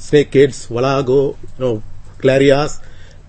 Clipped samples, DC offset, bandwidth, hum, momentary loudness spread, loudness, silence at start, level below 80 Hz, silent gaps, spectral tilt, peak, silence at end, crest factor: under 0.1%; under 0.1%; 8.8 kHz; none; 11 LU; -15 LUFS; 0 s; -34 dBFS; none; -6 dB/octave; 0 dBFS; 0.1 s; 16 dB